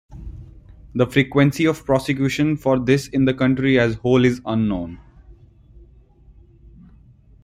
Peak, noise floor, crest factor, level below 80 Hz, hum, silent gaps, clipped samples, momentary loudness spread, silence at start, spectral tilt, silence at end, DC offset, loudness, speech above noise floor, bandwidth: -2 dBFS; -49 dBFS; 18 dB; -44 dBFS; none; none; under 0.1%; 12 LU; 0.1 s; -7 dB/octave; 2.1 s; under 0.1%; -19 LUFS; 31 dB; 15.5 kHz